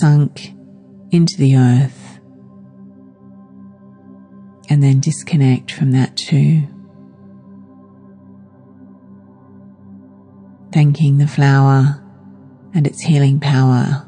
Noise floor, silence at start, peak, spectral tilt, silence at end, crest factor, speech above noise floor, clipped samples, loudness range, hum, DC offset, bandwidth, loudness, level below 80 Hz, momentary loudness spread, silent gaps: -42 dBFS; 0 s; -2 dBFS; -7 dB/octave; 0.05 s; 14 dB; 30 dB; under 0.1%; 7 LU; none; under 0.1%; 10 kHz; -14 LUFS; -64 dBFS; 8 LU; none